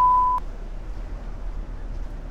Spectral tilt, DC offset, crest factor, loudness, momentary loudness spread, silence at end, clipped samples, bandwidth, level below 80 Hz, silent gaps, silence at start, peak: -7 dB/octave; under 0.1%; 14 dB; -27 LUFS; 18 LU; 0 s; under 0.1%; 7 kHz; -32 dBFS; none; 0 s; -10 dBFS